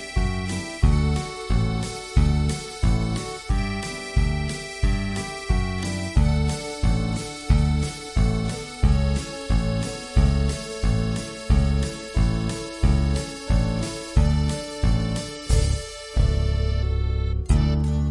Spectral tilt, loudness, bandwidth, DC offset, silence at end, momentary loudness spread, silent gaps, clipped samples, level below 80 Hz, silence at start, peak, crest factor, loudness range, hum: -6 dB/octave; -24 LUFS; 11.5 kHz; under 0.1%; 0 s; 7 LU; none; under 0.1%; -24 dBFS; 0 s; -4 dBFS; 18 dB; 2 LU; none